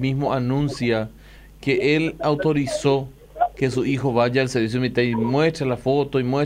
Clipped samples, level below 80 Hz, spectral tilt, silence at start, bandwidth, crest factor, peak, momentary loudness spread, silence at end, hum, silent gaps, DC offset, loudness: under 0.1%; -46 dBFS; -6.5 dB/octave; 0 s; 14.5 kHz; 14 dB; -6 dBFS; 5 LU; 0 s; none; none; under 0.1%; -21 LUFS